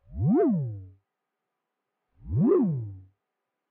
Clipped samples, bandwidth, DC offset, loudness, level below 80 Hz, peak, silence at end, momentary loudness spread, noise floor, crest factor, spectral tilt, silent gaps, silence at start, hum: under 0.1%; 2.8 kHz; under 0.1%; -26 LUFS; -52 dBFS; -12 dBFS; 0.7 s; 16 LU; -84 dBFS; 16 dB; -13.5 dB/octave; none; 0.1 s; none